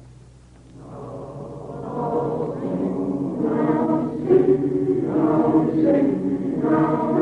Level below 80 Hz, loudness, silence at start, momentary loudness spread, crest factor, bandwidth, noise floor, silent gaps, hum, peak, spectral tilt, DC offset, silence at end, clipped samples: -52 dBFS; -21 LUFS; 0 s; 17 LU; 16 dB; 4.9 kHz; -47 dBFS; none; none; -6 dBFS; -10 dB/octave; under 0.1%; 0 s; under 0.1%